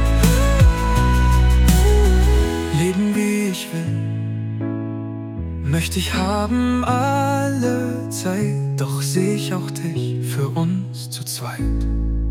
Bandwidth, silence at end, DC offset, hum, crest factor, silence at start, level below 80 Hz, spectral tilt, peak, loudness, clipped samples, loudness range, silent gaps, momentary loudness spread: 17 kHz; 0 s; under 0.1%; none; 14 dB; 0 s; -22 dBFS; -6 dB/octave; -4 dBFS; -20 LUFS; under 0.1%; 6 LU; none; 10 LU